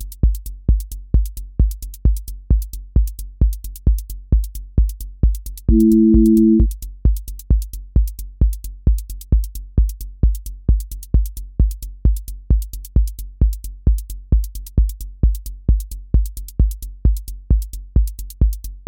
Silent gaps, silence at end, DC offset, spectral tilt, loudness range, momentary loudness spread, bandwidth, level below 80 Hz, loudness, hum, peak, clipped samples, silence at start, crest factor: none; 0.05 s; under 0.1%; -9 dB/octave; 6 LU; 9 LU; 17 kHz; -18 dBFS; -20 LUFS; none; -2 dBFS; under 0.1%; 0 s; 16 dB